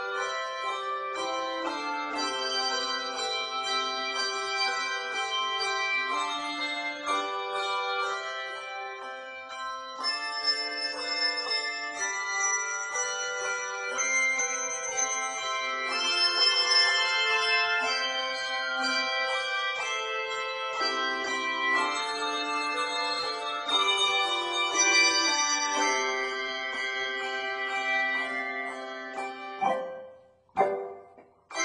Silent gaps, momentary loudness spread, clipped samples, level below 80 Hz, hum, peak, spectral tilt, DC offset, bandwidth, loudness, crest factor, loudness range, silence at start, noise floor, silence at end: none; 9 LU; under 0.1%; -74 dBFS; none; -12 dBFS; 1 dB/octave; under 0.1%; 12 kHz; -27 LUFS; 18 dB; 7 LU; 0 s; -55 dBFS; 0 s